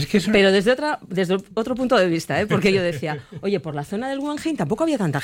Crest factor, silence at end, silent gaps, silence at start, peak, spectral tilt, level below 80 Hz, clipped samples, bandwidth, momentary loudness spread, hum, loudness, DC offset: 16 dB; 0 s; none; 0 s; -4 dBFS; -5.5 dB/octave; -52 dBFS; under 0.1%; 16.5 kHz; 10 LU; none; -21 LUFS; under 0.1%